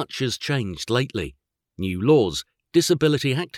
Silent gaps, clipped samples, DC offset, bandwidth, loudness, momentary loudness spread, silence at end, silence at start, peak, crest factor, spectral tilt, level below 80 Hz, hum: none; under 0.1%; under 0.1%; 16 kHz; -22 LUFS; 12 LU; 0 s; 0 s; -6 dBFS; 16 dB; -5 dB/octave; -52 dBFS; none